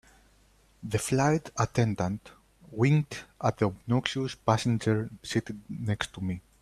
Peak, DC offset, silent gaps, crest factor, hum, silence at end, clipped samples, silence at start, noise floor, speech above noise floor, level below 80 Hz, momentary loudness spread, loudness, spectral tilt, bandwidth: -6 dBFS; under 0.1%; none; 22 dB; none; 0.2 s; under 0.1%; 0.8 s; -62 dBFS; 34 dB; -56 dBFS; 10 LU; -29 LUFS; -6 dB/octave; 13.5 kHz